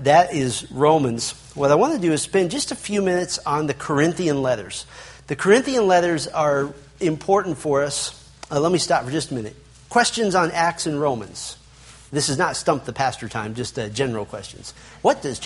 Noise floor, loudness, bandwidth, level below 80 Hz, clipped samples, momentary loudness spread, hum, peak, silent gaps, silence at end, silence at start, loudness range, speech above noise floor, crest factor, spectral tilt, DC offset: -46 dBFS; -21 LUFS; 11.5 kHz; -52 dBFS; under 0.1%; 14 LU; none; -2 dBFS; none; 0 s; 0 s; 4 LU; 25 dB; 20 dB; -4.5 dB/octave; under 0.1%